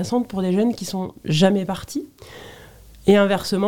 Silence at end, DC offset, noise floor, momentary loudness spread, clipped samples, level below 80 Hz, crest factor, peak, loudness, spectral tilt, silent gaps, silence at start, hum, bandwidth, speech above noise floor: 0 s; under 0.1%; -45 dBFS; 23 LU; under 0.1%; -50 dBFS; 18 dB; -4 dBFS; -20 LUFS; -6 dB/octave; none; 0 s; none; 16.5 kHz; 24 dB